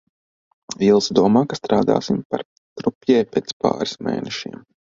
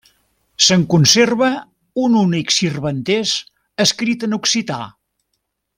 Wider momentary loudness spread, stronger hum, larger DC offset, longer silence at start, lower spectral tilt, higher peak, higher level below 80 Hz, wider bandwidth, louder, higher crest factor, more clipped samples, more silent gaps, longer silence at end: about the same, 13 LU vs 15 LU; neither; neither; about the same, 0.7 s vs 0.6 s; first, -5.5 dB/octave vs -3.5 dB/octave; about the same, 0 dBFS vs 0 dBFS; about the same, -56 dBFS vs -56 dBFS; second, 7.6 kHz vs 16.5 kHz; second, -20 LUFS vs -15 LUFS; about the same, 20 dB vs 18 dB; neither; first, 2.25-2.30 s, 2.45-2.76 s, 2.95-3.01 s, 3.53-3.60 s vs none; second, 0.35 s vs 0.9 s